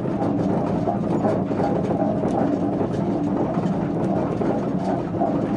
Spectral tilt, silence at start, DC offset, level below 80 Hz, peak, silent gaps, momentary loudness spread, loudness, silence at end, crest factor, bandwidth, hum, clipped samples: -9 dB/octave; 0 s; under 0.1%; -46 dBFS; -8 dBFS; none; 2 LU; -23 LUFS; 0 s; 14 dB; 10.5 kHz; none; under 0.1%